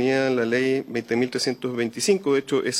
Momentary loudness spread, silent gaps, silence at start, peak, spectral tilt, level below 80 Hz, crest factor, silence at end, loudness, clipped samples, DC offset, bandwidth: 5 LU; none; 0 s; -8 dBFS; -4 dB/octave; -68 dBFS; 16 dB; 0 s; -23 LUFS; under 0.1%; under 0.1%; 15.5 kHz